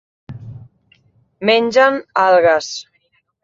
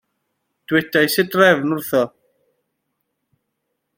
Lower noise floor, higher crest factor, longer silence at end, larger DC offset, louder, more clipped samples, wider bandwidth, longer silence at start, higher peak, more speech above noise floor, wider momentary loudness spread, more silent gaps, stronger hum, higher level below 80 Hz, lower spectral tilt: second, -63 dBFS vs -75 dBFS; about the same, 16 dB vs 20 dB; second, 0.6 s vs 1.9 s; neither; first, -14 LUFS vs -17 LUFS; neither; second, 7.8 kHz vs 16.5 kHz; second, 0.3 s vs 0.7 s; about the same, -2 dBFS vs -2 dBFS; second, 49 dB vs 59 dB; first, 22 LU vs 7 LU; neither; neither; first, -58 dBFS vs -64 dBFS; about the same, -4 dB/octave vs -4.5 dB/octave